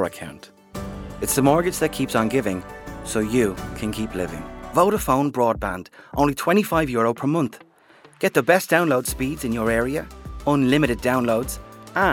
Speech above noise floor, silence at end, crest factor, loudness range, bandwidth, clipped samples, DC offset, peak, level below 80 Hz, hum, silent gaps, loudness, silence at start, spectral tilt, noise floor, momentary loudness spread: 30 dB; 0 s; 20 dB; 3 LU; 18 kHz; under 0.1%; under 0.1%; -2 dBFS; -42 dBFS; none; none; -22 LUFS; 0 s; -5 dB/octave; -52 dBFS; 16 LU